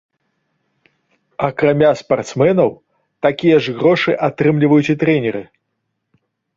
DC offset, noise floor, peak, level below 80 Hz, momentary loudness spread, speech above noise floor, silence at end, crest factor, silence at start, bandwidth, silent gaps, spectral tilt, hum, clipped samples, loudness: under 0.1%; -73 dBFS; -2 dBFS; -56 dBFS; 8 LU; 58 dB; 1.15 s; 16 dB; 1.4 s; 7.8 kHz; none; -7 dB/octave; none; under 0.1%; -15 LUFS